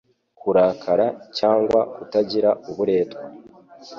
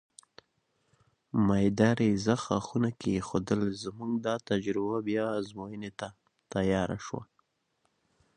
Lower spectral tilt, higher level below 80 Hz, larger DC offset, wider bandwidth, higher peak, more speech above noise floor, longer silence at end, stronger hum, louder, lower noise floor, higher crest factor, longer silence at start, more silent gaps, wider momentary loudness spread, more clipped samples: about the same, -6.5 dB/octave vs -6.5 dB/octave; about the same, -60 dBFS vs -56 dBFS; neither; second, 7.4 kHz vs 10 kHz; first, -6 dBFS vs -10 dBFS; second, 23 dB vs 47 dB; second, 0 s vs 1.15 s; neither; first, -21 LUFS vs -30 LUFS; second, -44 dBFS vs -76 dBFS; second, 16 dB vs 22 dB; second, 0.45 s vs 1.35 s; neither; second, 10 LU vs 15 LU; neither